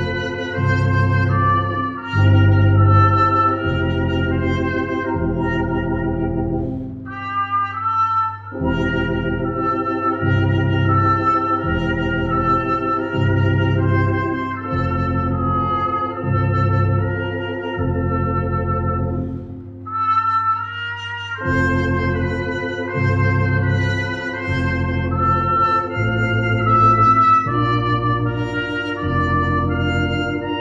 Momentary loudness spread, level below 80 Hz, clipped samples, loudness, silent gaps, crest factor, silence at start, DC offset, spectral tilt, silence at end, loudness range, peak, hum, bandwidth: 9 LU; -36 dBFS; under 0.1%; -19 LUFS; none; 16 dB; 0 s; under 0.1%; -8 dB/octave; 0 s; 5 LU; -2 dBFS; none; 7.4 kHz